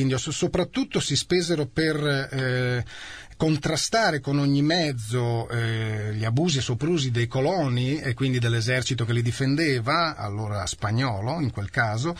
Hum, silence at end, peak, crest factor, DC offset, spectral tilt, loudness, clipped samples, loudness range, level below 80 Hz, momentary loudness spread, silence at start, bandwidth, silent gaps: none; 0 s; -10 dBFS; 14 dB; 0.2%; -5 dB/octave; -25 LUFS; under 0.1%; 1 LU; -50 dBFS; 5 LU; 0 s; 13.5 kHz; none